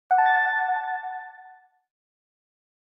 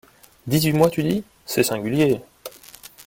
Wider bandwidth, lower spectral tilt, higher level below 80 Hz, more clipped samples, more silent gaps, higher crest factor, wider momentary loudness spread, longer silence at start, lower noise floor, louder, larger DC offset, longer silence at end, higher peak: second, 5.6 kHz vs 17 kHz; second, 0 dB/octave vs -5.5 dB/octave; second, under -90 dBFS vs -54 dBFS; neither; neither; about the same, 16 dB vs 20 dB; second, 18 LU vs 21 LU; second, 0.1 s vs 0.45 s; first, -52 dBFS vs -45 dBFS; about the same, -23 LUFS vs -21 LUFS; neither; first, 1.45 s vs 0.05 s; second, -10 dBFS vs -2 dBFS